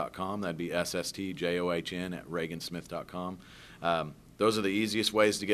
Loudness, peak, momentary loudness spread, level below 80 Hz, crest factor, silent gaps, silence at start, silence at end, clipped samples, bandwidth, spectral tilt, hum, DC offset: -32 LUFS; -10 dBFS; 12 LU; -62 dBFS; 22 dB; none; 0 s; 0 s; under 0.1%; 14 kHz; -4 dB/octave; none; under 0.1%